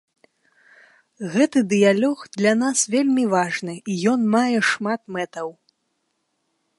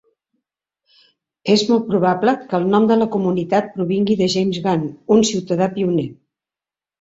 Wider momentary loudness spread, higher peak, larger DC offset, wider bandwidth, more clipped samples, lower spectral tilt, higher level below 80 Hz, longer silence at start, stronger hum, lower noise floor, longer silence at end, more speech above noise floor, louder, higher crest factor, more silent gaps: first, 11 LU vs 5 LU; about the same, -4 dBFS vs -2 dBFS; neither; first, 11.5 kHz vs 8 kHz; neither; second, -4 dB/octave vs -5.5 dB/octave; second, -72 dBFS vs -58 dBFS; second, 1.2 s vs 1.45 s; neither; second, -73 dBFS vs -90 dBFS; first, 1.3 s vs 0.9 s; second, 53 dB vs 73 dB; about the same, -20 LUFS vs -18 LUFS; about the same, 18 dB vs 16 dB; neither